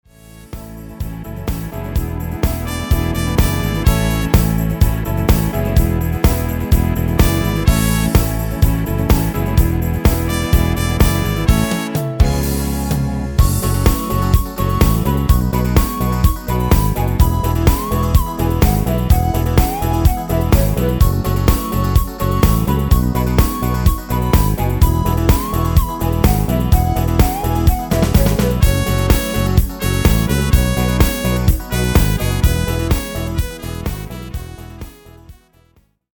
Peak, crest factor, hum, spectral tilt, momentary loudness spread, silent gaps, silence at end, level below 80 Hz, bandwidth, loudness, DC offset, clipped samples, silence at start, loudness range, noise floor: 0 dBFS; 14 dB; none; -6 dB/octave; 7 LU; none; 0.85 s; -18 dBFS; over 20 kHz; -16 LUFS; under 0.1%; under 0.1%; 0.35 s; 3 LU; -55 dBFS